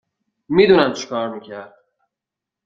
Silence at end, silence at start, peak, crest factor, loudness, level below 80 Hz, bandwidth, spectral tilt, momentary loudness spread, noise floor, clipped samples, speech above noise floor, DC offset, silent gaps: 1 s; 0.5 s; -2 dBFS; 18 dB; -17 LUFS; -58 dBFS; 7.4 kHz; -5.5 dB/octave; 22 LU; -86 dBFS; under 0.1%; 68 dB; under 0.1%; none